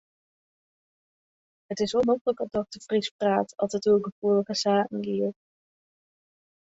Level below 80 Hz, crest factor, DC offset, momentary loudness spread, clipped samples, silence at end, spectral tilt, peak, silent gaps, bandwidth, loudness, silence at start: -66 dBFS; 18 dB; under 0.1%; 7 LU; under 0.1%; 1.4 s; -5 dB/octave; -10 dBFS; 2.21-2.25 s, 3.11-3.19 s, 4.12-4.22 s; 8 kHz; -26 LUFS; 1.7 s